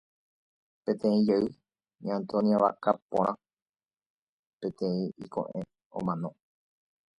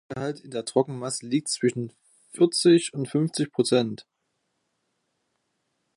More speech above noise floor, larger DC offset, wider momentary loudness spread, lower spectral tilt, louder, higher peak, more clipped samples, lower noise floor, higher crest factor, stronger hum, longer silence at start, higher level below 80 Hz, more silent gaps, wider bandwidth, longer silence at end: first, over 62 dB vs 52 dB; neither; about the same, 14 LU vs 14 LU; first, -8.5 dB/octave vs -5 dB/octave; second, -30 LUFS vs -25 LUFS; about the same, -8 dBFS vs -8 dBFS; neither; first, under -90 dBFS vs -77 dBFS; about the same, 22 dB vs 20 dB; neither; first, 0.85 s vs 0.1 s; about the same, -68 dBFS vs -72 dBFS; first, 3.02-3.09 s, 3.62-3.66 s, 4.06-4.58 s, 5.86-5.90 s vs none; second, 8 kHz vs 11.5 kHz; second, 0.9 s vs 1.95 s